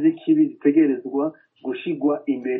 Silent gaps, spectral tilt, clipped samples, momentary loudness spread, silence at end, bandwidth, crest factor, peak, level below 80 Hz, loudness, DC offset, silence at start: none; -6.5 dB/octave; under 0.1%; 11 LU; 0 s; 3.9 kHz; 16 dB; -6 dBFS; -74 dBFS; -21 LUFS; under 0.1%; 0 s